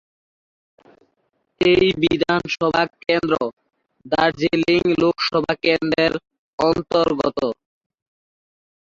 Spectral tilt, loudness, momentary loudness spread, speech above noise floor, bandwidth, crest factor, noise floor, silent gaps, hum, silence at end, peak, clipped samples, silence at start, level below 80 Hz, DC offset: -6 dB/octave; -19 LUFS; 8 LU; 51 dB; 7.6 kHz; 16 dB; -70 dBFS; 3.53-3.57 s, 6.38-6.58 s; none; 1.3 s; -4 dBFS; under 0.1%; 1.6 s; -50 dBFS; under 0.1%